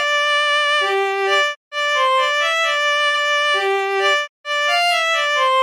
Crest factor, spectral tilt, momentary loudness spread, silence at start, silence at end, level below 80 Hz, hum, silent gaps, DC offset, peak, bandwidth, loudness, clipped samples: 14 dB; 2 dB/octave; 4 LU; 0 s; 0 s; -74 dBFS; none; 1.56-1.71 s, 4.29-4.44 s; under 0.1%; -4 dBFS; 17 kHz; -16 LUFS; under 0.1%